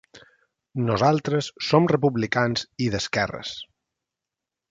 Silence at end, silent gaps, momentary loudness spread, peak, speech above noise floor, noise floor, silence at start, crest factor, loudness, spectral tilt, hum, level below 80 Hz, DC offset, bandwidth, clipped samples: 1.05 s; none; 14 LU; -4 dBFS; 64 dB; -87 dBFS; 0.15 s; 22 dB; -23 LUFS; -5.5 dB/octave; none; -54 dBFS; under 0.1%; 8.8 kHz; under 0.1%